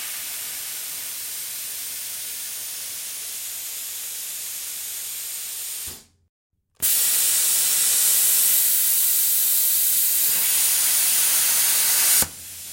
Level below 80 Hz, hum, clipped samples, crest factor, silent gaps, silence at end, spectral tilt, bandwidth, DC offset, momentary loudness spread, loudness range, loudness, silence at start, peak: -64 dBFS; none; under 0.1%; 18 dB; 6.29-6.50 s; 0 s; 2.5 dB/octave; 16.5 kHz; under 0.1%; 13 LU; 12 LU; -19 LUFS; 0 s; -4 dBFS